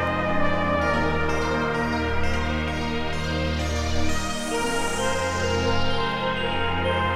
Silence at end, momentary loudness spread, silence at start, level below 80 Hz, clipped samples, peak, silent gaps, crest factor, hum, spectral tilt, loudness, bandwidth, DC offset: 0 s; 4 LU; 0 s; -32 dBFS; under 0.1%; -10 dBFS; none; 12 dB; none; -4.5 dB/octave; -25 LUFS; 13.5 kHz; under 0.1%